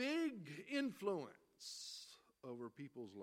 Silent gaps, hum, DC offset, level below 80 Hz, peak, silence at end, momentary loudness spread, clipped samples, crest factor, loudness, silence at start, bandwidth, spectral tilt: none; none; under 0.1%; under -90 dBFS; -30 dBFS; 0 s; 14 LU; under 0.1%; 18 dB; -47 LUFS; 0 s; 16 kHz; -4 dB/octave